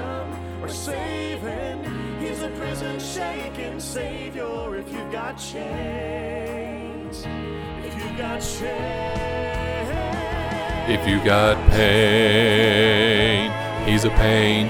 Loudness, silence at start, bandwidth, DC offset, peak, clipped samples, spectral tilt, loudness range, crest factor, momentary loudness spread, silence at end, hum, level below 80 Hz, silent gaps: -22 LUFS; 0 s; 19.5 kHz; under 0.1%; 0 dBFS; under 0.1%; -5 dB/octave; 13 LU; 22 dB; 15 LU; 0 s; none; -32 dBFS; none